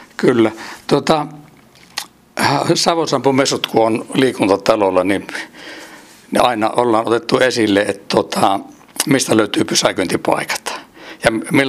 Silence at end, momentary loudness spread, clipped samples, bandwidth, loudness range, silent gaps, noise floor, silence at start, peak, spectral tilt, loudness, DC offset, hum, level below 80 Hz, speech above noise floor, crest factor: 0 s; 14 LU; under 0.1%; 16 kHz; 2 LU; none; -45 dBFS; 0 s; 0 dBFS; -4 dB/octave; -16 LUFS; under 0.1%; none; -52 dBFS; 30 dB; 16 dB